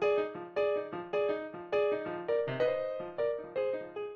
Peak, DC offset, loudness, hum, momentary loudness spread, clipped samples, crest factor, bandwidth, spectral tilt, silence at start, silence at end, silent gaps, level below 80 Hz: -20 dBFS; under 0.1%; -34 LUFS; none; 5 LU; under 0.1%; 14 dB; 6.6 kHz; -7 dB/octave; 0 s; 0 s; none; -72 dBFS